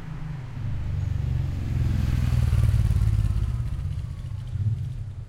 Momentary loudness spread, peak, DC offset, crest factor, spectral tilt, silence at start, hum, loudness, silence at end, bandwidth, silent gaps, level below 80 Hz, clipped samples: 11 LU; -10 dBFS; under 0.1%; 16 dB; -7.5 dB/octave; 0 s; none; -27 LUFS; 0 s; 13 kHz; none; -28 dBFS; under 0.1%